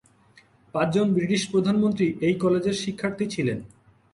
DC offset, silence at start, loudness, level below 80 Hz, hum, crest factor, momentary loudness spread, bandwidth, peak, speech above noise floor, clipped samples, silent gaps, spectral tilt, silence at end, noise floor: under 0.1%; 0.75 s; -24 LUFS; -60 dBFS; none; 16 dB; 7 LU; 11 kHz; -8 dBFS; 34 dB; under 0.1%; none; -6 dB/octave; 0.5 s; -57 dBFS